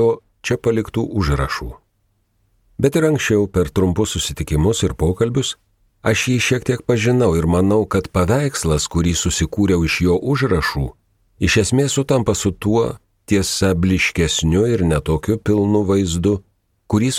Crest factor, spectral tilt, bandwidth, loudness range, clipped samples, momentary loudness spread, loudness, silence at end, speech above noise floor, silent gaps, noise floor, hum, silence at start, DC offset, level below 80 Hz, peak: 16 dB; -5 dB/octave; 16 kHz; 3 LU; under 0.1%; 6 LU; -18 LUFS; 0 s; 47 dB; none; -64 dBFS; none; 0 s; under 0.1%; -32 dBFS; -2 dBFS